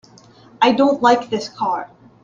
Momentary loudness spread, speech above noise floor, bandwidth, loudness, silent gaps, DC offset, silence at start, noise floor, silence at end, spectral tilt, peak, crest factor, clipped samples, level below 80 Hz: 12 LU; 30 dB; 7.6 kHz; -17 LUFS; none; under 0.1%; 0.6 s; -47 dBFS; 0.4 s; -4.5 dB/octave; -2 dBFS; 18 dB; under 0.1%; -62 dBFS